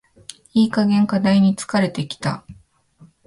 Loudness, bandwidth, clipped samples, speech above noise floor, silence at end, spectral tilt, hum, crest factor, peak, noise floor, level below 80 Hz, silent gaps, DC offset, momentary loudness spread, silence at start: -19 LUFS; 11.5 kHz; under 0.1%; 34 dB; 0.75 s; -6.5 dB/octave; none; 14 dB; -6 dBFS; -51 dBFS; -56 dBFS; none; under 0.1%; 15 LU; 0.55 s